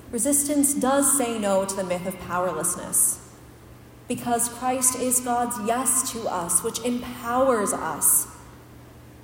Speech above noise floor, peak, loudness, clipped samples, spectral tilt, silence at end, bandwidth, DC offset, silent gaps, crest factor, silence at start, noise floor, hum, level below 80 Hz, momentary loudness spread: 23 dB; -4 dBFS; -22 LUFS; under 0.1%; -3 dB/octave; 0 s; 17 kHz; under 0.1%; none; 20 dB; 0 s; -46 dBFS; none; -54 dBFS; 9 LU